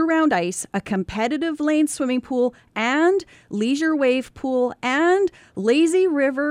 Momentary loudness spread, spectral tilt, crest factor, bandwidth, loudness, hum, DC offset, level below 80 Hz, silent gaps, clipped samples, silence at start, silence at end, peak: 7 LU; -4.5 dB/octave; 14 dB; 14.5 kHz; -21 LUFS; none; under 0.1%; -56 dBFS; none; under 0.1%; 0 s; 0 s; -6 dBFS